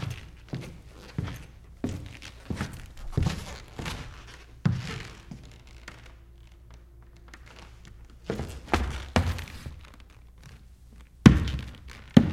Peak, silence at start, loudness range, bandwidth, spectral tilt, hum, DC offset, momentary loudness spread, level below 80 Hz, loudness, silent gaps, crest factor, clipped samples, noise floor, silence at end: 0 dBFS; 0 s; 16 LU; 15.5 kHz; -6.5 dB/octave; none; under 0.1%; 27 LU; -40 dBFS; -29 LUFS; none; 30 dB; under 0.1%; -50 dBFS; 0 s